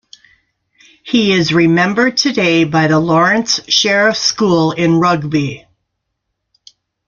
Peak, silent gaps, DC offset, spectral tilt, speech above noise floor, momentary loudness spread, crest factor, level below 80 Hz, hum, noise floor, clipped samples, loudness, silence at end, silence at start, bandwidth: 0 dBFS; none; under 0.1%; -4.5 dB/octave; 60 dB; 5 LU; 14 dB; -52 dBFS; none; -73 dBFS; under 0.1%; -12 LUFS; 1.5 s; 1.05 s; 7.4 kHz